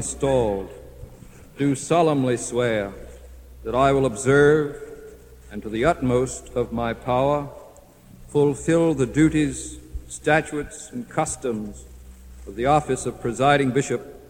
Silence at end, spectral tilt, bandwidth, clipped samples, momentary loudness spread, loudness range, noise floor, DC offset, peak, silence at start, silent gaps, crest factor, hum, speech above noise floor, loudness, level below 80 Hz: 0.05 s; -5.5 dB/octave; 16.5 kHz; under 0.1%; 18 LU; 4 LU; -48 dBFS; under 0.1%; -4 dBFS; 0 s; none; 18 dB; none; 26 dB; -22 LUFS; -42 dBFS